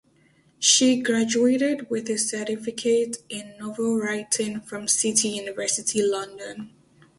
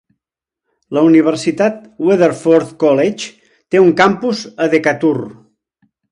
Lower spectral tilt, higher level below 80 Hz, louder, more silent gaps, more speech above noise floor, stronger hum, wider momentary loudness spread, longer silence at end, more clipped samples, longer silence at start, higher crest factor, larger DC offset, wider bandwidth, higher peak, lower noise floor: second, -2 dB/octave vs -6 dB/octave; second, -68 dBFS vs -60 dBFS; second, -23 LUFS vs -13 LUFS; neither; second, 36 dB vs 70 dB; neither; first, 17 LU vs 10 LU; second, 0.5 s vs 0.8 s; neither; second, 0.6 s vs 0.9 s; first, 20 dB vs 14 dB; neither; about the same, 11.5 kHz vs 11 kHz; second, -4 dBFS vs 0 dBFS; second, -60 dBFS vs -82 dBFS